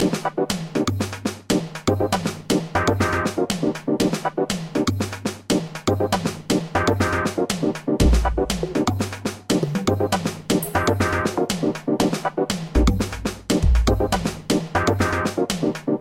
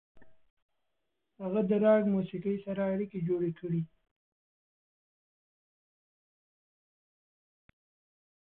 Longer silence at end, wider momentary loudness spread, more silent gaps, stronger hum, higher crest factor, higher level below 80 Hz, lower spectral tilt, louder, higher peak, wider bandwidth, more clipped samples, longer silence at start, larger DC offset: second, 0 s vs 4.55 s; second, 5 LU vs 10 LU; second, none vs 0.50-0.69 s; neither; about the same, 16 dB vs 20 dB; first, -30 dBFS vs -70 dBFS; second, -5 dB/octave vs -11.5 dB/octave; first, -22 LUFS vs -31 LUFS; first, -4 dBFS vs -16 dBFS; first, 16.5 kHz vs 3.9 kHz; neither; second, 0 s vs 0.15 s; neither